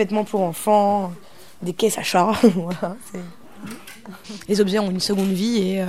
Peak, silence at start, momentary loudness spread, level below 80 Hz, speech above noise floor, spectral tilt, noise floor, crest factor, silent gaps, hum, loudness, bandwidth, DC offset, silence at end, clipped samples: -2 dBFS; 0 s; 20 LU; -56 dBFS; 20 dB; -5 dB/octave; -40 dBFS; 18 dB; none; none; -20 LUFS; 16 kHz; 0.8%; 0 s; under 0.1%